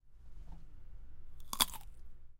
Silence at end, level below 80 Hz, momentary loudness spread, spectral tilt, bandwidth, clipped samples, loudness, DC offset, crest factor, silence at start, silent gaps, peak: 0 s; -50 dBFS; 26 LU; -0.5 dB/octave; 17 kHz; under 0.1%; -35 LUFS; under 0.1%; 34 dB; 0.05 s; none; -8 dBFS